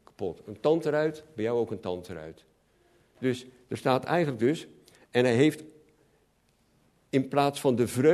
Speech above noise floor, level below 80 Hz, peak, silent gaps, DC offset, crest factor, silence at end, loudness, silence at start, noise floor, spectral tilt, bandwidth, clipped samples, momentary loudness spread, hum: 41 dB; -66 dBFS; -8 dBFS; none; under 0.1%; 20 dB; 0 s; -28 LUFS; 0.2 s; -68 dBFS; -6 dB/octave; 13.5 kHz; under 0.1%; 13 LU; none